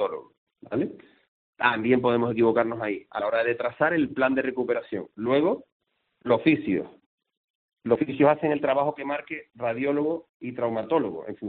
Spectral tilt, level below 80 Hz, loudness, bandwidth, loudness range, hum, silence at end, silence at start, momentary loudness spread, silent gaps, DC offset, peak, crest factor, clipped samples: -5 dB/octave; -66 dBFS; -25 LUFS; 4.5 kHz; 3 LU; none; 0 s; 0 s; 11 LU; 0.38-0.47 s, 1.28-1.53 s, 5.72-5.80 s, 7.06-7.18 s, 7.37-7.77 s, 10.29-10.40 s; under 0.1%; -6 dBFS; 20 dB; under 0.1%